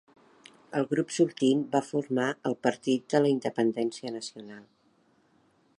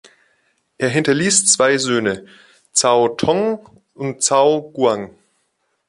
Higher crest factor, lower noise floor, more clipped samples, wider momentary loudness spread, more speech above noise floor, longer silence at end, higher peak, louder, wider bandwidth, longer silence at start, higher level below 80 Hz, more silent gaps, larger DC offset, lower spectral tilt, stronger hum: about the same, 20 dB vs 18 dB; about the same, -66 dBFS vs -68 dBFS; neither; about the same, 12 LU vs 14 LU; second, 39 dB vs 52 dB; first, 1.15 s vs 0.8 s; second, -8 dBFS vs 0 dBFS; second, -28 LUFS vs -16 LUFS; about the same, 11.5 kHz vs 11.5 kHz; about the same, 0.7 s vs 0.8 s; second, -80 dBFS vs -56 dBFS; neither; neither; first, -5.5 dB/octave vs -3 dB/octave; neither